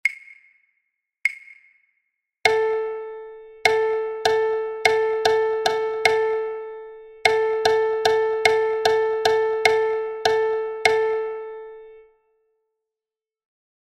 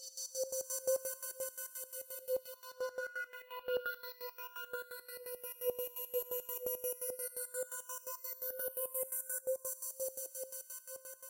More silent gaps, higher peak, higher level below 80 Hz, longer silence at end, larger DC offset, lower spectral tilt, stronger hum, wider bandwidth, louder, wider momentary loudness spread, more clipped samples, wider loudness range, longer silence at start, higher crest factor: neither; first, 0 dBFS vs -22 dBFS; first, -60 dBFS vs -84 dBFS; first, 1.85 s vs 0 s; neither; first, -1.5 dB/octave vs 1 dB/octave; neither; second, 15 kHz vs 17 kHz; first, -21 LUFS vs -40 LUFS; first, 16 LU vs 8 LU; neither; first, 6 LU vs 3 LU; about the same, 0.05 s vs 0 s; about the same, 22 dB vs 20 dB